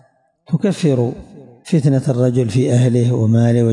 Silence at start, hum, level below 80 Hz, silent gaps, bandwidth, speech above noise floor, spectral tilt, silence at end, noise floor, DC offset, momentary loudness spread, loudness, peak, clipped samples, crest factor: 0.5 s; none; -52 dBFS; none; 11 kHz; 36 dB; -8 dB/octave; 0 s; -50 dBFS; under 0.1%; 6 LU; -16 LUFS; -6 dBFS; under 0.1%; 10 dB